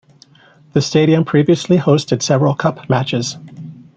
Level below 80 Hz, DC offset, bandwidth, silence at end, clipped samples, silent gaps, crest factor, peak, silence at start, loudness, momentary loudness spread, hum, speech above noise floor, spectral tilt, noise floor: -54 dBFS; under 0.1%; 9 kHz; 0.15 s; under 0.1%; none; 14 dB; -2 dBFS; 0.75 s; -15 LUFS; 11 LU; none; 34 dB; -6 dB/octave; -48 dBFS